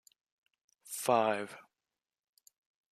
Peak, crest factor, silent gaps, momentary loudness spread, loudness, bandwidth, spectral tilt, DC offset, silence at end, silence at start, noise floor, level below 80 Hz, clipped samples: -14 dBFS; 24 dB; none; 18 LU; -32 LUFS; 14.5 kHz; -3.5 dB/octave; under 0.1%; 1.3 s; 0.85 s; under -90 dBFS; -88 dBFS; under 0.1%